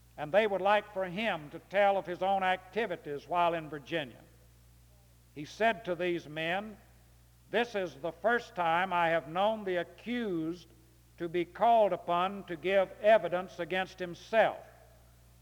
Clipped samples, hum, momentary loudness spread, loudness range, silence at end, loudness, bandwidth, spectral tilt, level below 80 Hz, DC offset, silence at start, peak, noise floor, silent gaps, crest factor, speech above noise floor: under 0.1%; none; 11 LU; 6 LU; 0.75 s; -31 LUFS; 20 kHz; -5.5 dB/octave; -64 dBFS; under 0.1%; 0.15 s; -14 dBFS; -61 dBFS; none; 18 dB; 29 dB